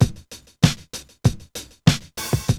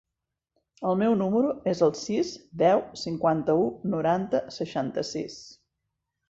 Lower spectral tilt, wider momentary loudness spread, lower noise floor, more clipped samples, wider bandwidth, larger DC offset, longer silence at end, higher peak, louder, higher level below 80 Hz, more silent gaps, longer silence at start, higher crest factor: about the same, -5 dB/octave vs -6 dB/octave; first, 16 LU vs 10 LU; second, -43 dBFS vs -85 dBFS; neither; first, 19.5 kHz vs 8 kHz; neither; second, 0 s vs 0.75 s; first, 0 dBFS vs -10 dBFS; first, -22 LUFS vs -26 LUFS; first, -38 dBFS vs -64 dBFS; neither; second, 0 s vs 0.8 s; about the same, 22 dB vs 18 dB